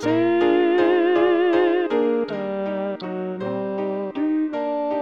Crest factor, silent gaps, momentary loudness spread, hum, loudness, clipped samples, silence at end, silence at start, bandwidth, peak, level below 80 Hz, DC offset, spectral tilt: 14 dB; none; 9 LU; none; -21 LUFS; under 0.1%; 0 s; 0 s; 6.6 kHz; -6 dBFS; -64 dBFS; under 0.1%; -7 dB/octave